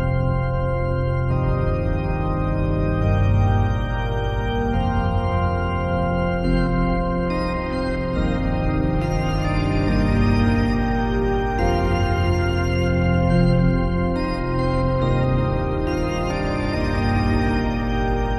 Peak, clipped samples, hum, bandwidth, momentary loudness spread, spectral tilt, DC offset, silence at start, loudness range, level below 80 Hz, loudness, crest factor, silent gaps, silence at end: -6 dBFS; under 0.1%; none; 11.5 kHz; 5 LU; -8 dB/octave; under 0.1%; 0 s; 2 LU; -26 dBFS; -21 LUFS; 14 dB; none; 0 s